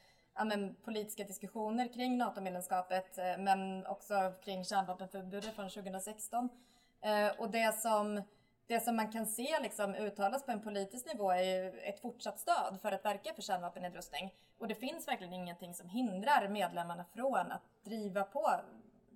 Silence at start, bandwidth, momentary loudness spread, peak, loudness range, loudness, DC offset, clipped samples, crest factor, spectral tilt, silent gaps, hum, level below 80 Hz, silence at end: 0.35 s; 18.5 kHz; 10 LU; -18 dBFS; 4 LU; -38 LUFS; under 0.1%; under 0.1%; 20 dB; -4 dB/octave; none; none; -78 dBFS; 0.35 s